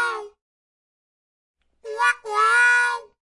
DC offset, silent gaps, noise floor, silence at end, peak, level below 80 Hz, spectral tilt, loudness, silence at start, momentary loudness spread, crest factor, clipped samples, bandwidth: under 0.1%; 0.41-1.54 s; under -90 dBFS; 0.2 s; -6 dBFS; -74 dBFS; 2 dB/octave; -19 LUFS; 0 s; 15 LU; 16 dB; under 0.1%; 11.5 kHz